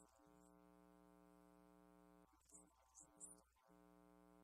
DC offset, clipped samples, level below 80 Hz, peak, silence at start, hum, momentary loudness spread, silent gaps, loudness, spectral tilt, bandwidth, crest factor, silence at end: under 0.1%; under 0.1%; -84 dBFS; -46 dBFS; 0 s; none; 8 LU; none; -64 LUFS; -4 dB/octave; 14 kHz; 24 dB; 0 s